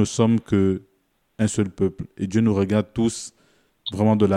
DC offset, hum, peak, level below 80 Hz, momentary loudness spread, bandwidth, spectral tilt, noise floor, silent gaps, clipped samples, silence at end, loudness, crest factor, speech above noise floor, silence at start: under 0.1%; none; -4 dBFS; -54 dBFS; 12 LU; 11.5 kHz; -6.5 dB/octave; -67 dBFS; none; under 0.1%; 0 s; -22 LUFS; 16 dB; 46 dB; 0 s